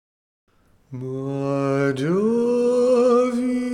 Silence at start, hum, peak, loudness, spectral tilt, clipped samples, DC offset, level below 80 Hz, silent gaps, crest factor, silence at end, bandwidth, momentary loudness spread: 0.9 s; none; -8 dBFS; -20 LUFS; -7.5 dB/octave; under 0.1%; under 0.1%; -62 dBFS; none; 14 dB; 0 s; 11 kHz; 13 LU